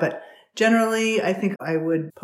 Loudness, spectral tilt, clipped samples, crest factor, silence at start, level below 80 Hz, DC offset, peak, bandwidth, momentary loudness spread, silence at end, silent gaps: -22 LUFS; -5 dB/octave; under 0.1%; 16 dB; 0 s; -84 dBFS; under 0.1%; -8 dBFS; 14.5 kHz; 11 LU; 0.15 s; none